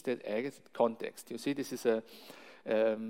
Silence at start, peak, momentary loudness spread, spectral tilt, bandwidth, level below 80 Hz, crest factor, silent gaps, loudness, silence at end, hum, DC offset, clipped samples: 0.05 s; -16 dBFS; 17 LU; -5 dB/octave; 16.5 kHz; -86 dBFS; 20 dB; none; -35 LUFS; 0 s; none; under 0.1%; under 0.1%